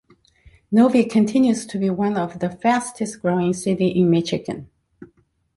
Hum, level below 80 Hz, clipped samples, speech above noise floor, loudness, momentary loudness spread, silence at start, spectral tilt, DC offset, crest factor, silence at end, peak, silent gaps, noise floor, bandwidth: none; -56 dBFS; under 0.1%; 41 dB; -20 LUFS; 10 LU; 0.7 s; -6.5 dB/octave; under 0.1%; 16 dB; 0.5 s; -4 dBFS; none; -60 dBFS; 11.5 kHz